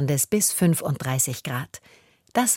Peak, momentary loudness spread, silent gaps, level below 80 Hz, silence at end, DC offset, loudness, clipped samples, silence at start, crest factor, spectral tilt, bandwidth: -6 dBFS; 13 LU; none; -60 dBFS; 0 s; under 0.1%; -23 LUFS; under 0.1%; 0 s; 18 dB; -4 dB/octave; 17 kHz